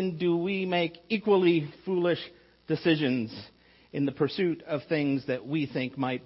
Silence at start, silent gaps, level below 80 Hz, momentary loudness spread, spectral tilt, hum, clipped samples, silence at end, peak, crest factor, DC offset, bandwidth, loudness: 0 s; none; -68 dBFS; 9 LU; -10 dB/octave; none; under 0.1%; 0.05 s; -12 dBFS; 16 dB; under 0.1%; 5.8 kHz; -28 LUFS